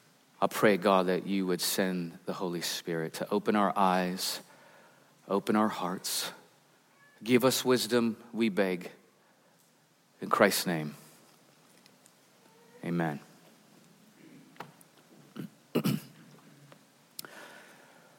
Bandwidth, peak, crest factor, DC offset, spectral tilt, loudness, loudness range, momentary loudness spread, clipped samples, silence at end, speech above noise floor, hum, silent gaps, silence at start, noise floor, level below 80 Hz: 17 kHz; -8 dBFS; 24 dB; under 0.1%; -4.5 dB/octave; -30 LUFS; 11 LU; 20 LU; under 0.1%; 0.55 s; 37 dB; none; none; 0.4 s; -66 dBFS; -78 dBFS